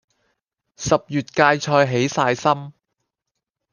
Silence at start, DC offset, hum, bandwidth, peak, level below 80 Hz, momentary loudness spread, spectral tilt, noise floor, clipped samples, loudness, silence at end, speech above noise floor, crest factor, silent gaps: 0.8 s; under 0.1%; none; 10 kHz; -2 dBFS; -54 dBFS; 8 LU; -5 dB/octave; -82 dBFS; under 0.1%; -19 LUFS; 1 s; 63 dB; 20 dB; none